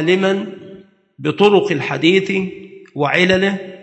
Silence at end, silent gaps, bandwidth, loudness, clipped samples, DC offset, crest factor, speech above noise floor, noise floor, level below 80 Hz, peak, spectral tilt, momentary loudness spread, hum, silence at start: 0.05 s; none; 8.6 kHz; -16 LUFS; under 0.1%; under 0.1%; 16 dB; 26 dB; -41 dBFS; -54 dBFS; 0 dBFS; -6 dB/octave; 17 LU; none; 0 s